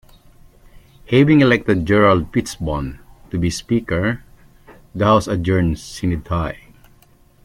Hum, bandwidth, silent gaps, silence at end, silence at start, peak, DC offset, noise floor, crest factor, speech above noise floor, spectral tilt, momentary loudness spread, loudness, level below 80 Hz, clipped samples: none; 15.5 kHz; none; 0.9 s; 0.75 s; -2 dBFS; under 0.1%; -51 dBFS; 18 dB; 34 dB; -6.5 dB/octave; 14 LU; -18 LUFS; -38 dBFS; under 0.1%